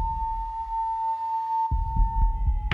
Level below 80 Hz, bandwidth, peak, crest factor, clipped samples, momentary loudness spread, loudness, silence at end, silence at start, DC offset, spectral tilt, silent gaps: -28 dBFS; 3.6 kHz; -10 dBFS; 14 dB; under 0.1%; 4 LU; -28 LUFS; 0 s; 0 s; under 0.1%; -7 dB/octave; none